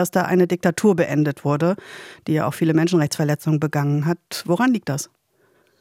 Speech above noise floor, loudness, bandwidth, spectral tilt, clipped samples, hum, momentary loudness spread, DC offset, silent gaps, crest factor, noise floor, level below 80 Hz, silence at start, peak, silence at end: 41 dB; -20 LUFS; 16.5 kHz; -6.5 dB/octave; under 0.1%; none; 9 LU; under 0.1%; none; 14 dB; -61 dBFS; -64 dBFS; 0 s; -6 dBFS; 0.75 s